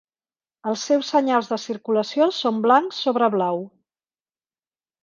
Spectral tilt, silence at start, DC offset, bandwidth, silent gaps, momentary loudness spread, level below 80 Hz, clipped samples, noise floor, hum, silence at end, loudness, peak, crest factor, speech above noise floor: -4.5 dB/octave; 0.65 s; under 0.1%; 7.4 kHz; none; 10 LU; -74 dBFS; under 0.1%; under -90 dBFS; none; 1.35 s; -21 LUFS; -4 dBFS; 20 dB; over 69 dB